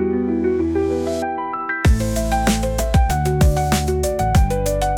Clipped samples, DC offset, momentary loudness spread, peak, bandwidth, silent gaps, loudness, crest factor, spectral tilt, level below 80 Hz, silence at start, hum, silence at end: under 0.1%; under 0.1%; 5 LU; -6 dBFS; 18 kHz; none; -19 LUFS; 12 dB; -6 dB/octave; -22 dBFS; 0 s; none; 0 s